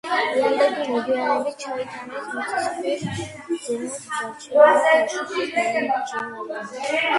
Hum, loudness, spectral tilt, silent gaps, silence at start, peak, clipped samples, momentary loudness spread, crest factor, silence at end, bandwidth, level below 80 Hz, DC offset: none; -22 LUFS; -3.5 dB/octave; none; 0.05 s; 0 dBFS; under 0.1%; 14 LU; 22 dB; 0 s; 11.5 kHz; -62 dBFS; under 0.1%